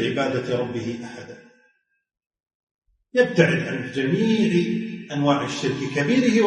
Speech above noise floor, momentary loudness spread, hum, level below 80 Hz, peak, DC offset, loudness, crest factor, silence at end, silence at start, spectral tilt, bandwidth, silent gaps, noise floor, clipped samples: 48 dB; 12 LU; none; -62 dBFS; -2 dBFS; under 0.1%; -22 LUFS; 20 dB; 0 s; 0 s; -6 dB/octave; 10.5 kHz; 2.55-2.79 s; -70 dBFS; under 0.1%